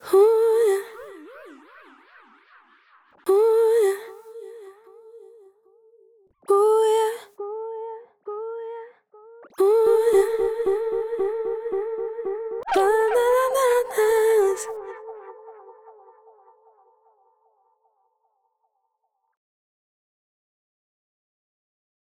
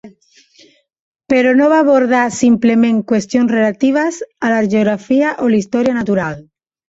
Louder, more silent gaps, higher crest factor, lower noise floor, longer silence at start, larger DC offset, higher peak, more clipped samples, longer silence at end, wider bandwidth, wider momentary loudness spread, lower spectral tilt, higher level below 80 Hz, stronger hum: second, -21 LUFS vs -14 LUFS; second, none vs 1.00-1.12 s; about the same, 16 dB vs 12 dB; first, -75 dBFS vs -49 dBFS; about the same, 0.05 s vs 0.05 s; neither; second, -8 dBFS vs -2 dBFS; neither; first, 6.4 s vs 0.5 s; first, 16 kHz vs 8 kHz; first, 23 LU vs 7 LU; second, -2.5 dB/octave vs -6 dB/octave; second, -66 dBFS vs -54 dBFS; neither